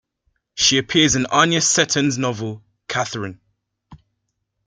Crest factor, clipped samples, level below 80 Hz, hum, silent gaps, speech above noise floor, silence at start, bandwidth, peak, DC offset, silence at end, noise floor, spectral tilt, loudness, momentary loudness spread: 20 dB; under 0.1%; -52 dBFS; none; none; 56 dB; 0.55 s; 10.5 kHz; -2 dBFS; under 0.1%; 0.7 s; -74 dBFS; -2.5 dB/octave; -17 LUFS; 16 LU